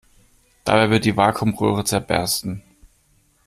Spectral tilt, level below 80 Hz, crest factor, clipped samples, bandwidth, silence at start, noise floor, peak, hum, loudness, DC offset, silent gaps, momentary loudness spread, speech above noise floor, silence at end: -4.5 dB/octave; -48 dBFS; 18 dB; under 0.1%; 15.5 kHz; 0.65 s; -60 dBFS; -2 dBFS; none; -19 LUFS; under 0.1%; none; 11 LU; 41 dB; 0.6 s